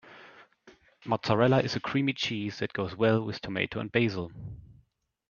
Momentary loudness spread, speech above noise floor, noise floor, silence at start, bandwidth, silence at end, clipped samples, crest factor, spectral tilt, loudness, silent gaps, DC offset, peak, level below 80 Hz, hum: 17 LU; 39 dB; -68 dBFS; 0.05 s; 7.2 kHz; 0.6 s; under 0.1%; 22 dB; -6.5 dB/octave; -29 LUFS; none; under 0.1%; -8 dBFS; -60 dBFS; none